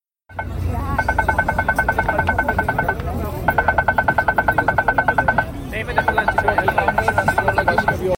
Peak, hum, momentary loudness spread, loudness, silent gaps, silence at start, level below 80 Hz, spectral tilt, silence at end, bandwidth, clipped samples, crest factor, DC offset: -2 dBFS; none; 7 LU; -18 LUFS; none; 0.3 s; -32 dBFS; -6 dB/octave; 0 s; 17 kHz; under 0.1%; 18 dB; under 0.1%